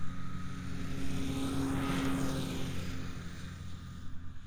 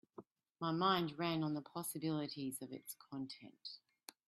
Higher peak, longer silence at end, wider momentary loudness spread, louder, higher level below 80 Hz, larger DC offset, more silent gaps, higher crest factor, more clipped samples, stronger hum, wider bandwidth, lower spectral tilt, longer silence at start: about the same, -22 dBFS vs -22 dBFS; second, 0 s vs 0.5 s; second, 13 LU vs 18 LU; first, -38 LUFS vs -41 LUFS; first, -46 dBFS vs -82 dBFS; neither; neither; second, 12 dB vs 20 dB; neither; neither; first, over 20 kHz vs 15.5 kHz; about the same, -5.5 dB/octave vs -5 dB/octave; second, 0 s vs 0.2 s